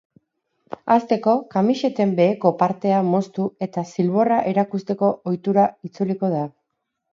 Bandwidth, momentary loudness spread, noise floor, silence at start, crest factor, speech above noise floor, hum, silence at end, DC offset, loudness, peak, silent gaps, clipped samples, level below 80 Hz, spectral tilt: 7.4 kHz; 8 LU; -77 dBFS; 0.85 s; 18 dB; 58 dB; none; 0.65 s; under 0.1%; -21 LUFS; -2 dBFS; none; under 0.1%; -68 dBFS; -8 dB/octave